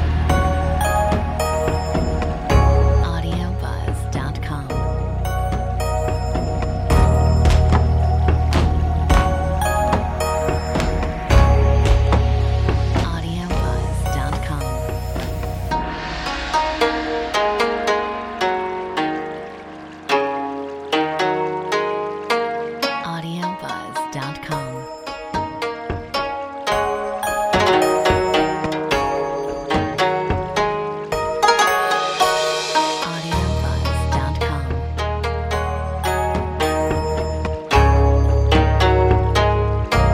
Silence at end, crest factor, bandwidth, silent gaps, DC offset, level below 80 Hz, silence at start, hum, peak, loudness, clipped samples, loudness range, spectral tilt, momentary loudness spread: 0 s; 18 dB; 16 kHz; none; under 0.1%; -24 dBFS; 0 s; none; 0 dBFS; -20 LUFS; under 0.1%; 6 LU; -5.5 dB/octave; 10 LU